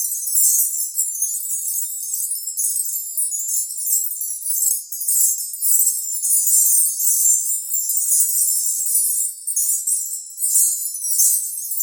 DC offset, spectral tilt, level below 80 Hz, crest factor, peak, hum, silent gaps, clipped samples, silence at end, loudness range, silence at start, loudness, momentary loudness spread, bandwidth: under 0.1%; 10.5 dB/octave; under -90 dBFS; 16 dB; -4 dBFS; none; none; under 0.1%; 0 s; 5 LU; 0 s; -16 LUFS; 8 LU; over 20 kHz